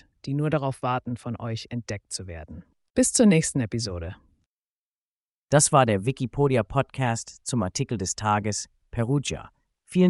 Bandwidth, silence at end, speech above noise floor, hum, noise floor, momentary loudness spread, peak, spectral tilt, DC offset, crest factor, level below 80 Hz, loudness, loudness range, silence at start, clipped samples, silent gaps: 11.5 kHz; 0 s; over 65 dB; none; under -90 dBFS; 15 LU; -6 dBFS; -5 dB/octave; under 0.1%; 20 dB; -50 dBFS; -25 LUFS; 4 LU; 0.25 s; under 0.1%; 2.90-2.94 s, 4.46-5.48 s